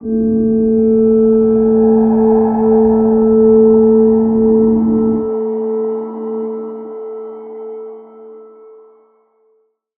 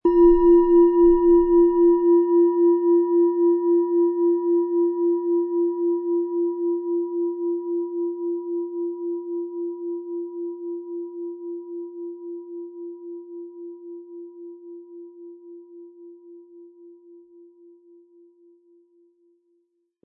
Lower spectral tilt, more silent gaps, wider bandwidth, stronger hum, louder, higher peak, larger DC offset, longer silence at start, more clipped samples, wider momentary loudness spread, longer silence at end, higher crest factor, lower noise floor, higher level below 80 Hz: first, -15 dB/octave vs -11.5 dB/octave; neither; first, 2.1 kHz vs 1.9 kHz; neither; first, -12 LUFS vs -21 LUFS; first, -2 dBFS vs -6 dBFS; neither; about the same, 0 s vs 0.05 s; neither; second, 18 LU vs 23 LU; second, 1.55 s vs 3.15 s; about the same, 12 dB vs 16 dB; second, -59 dBFS vs -70 dBFS; first, -42 dBFS vs -48 dBFS